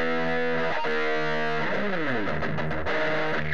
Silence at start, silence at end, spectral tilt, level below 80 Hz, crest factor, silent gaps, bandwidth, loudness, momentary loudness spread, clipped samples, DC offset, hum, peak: 0 s; 0 s; -6 dB/octave; -50 dBFS; 12 dB; none; 8 kHz; -27 LUFS; 3 LU; under 0.1%; 4%; none; -14 dBFS